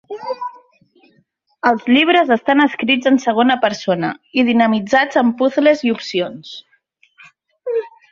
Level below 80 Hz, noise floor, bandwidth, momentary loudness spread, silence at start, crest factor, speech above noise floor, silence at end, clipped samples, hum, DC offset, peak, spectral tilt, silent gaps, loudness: -62 dBFS; -60 dBFS; 7.4 kHz; 13 LU; 0.1 s; 16 dB; 45 dB; 0.25 s; under 0.1%; none; under 0.1%; -2 dBFS; -5 dB/octave; none; -16 LUFS